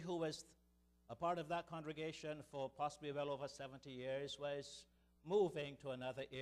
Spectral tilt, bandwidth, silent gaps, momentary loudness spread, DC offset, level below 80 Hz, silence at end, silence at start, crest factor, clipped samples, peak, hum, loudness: -5 dB/octave; 13 kHz; none; 12 LU; under 0.1%; -76 dBFS; 0 s; 0 s; 18 dB; under 0.1%; -28 dBFS; none; -46 LUFS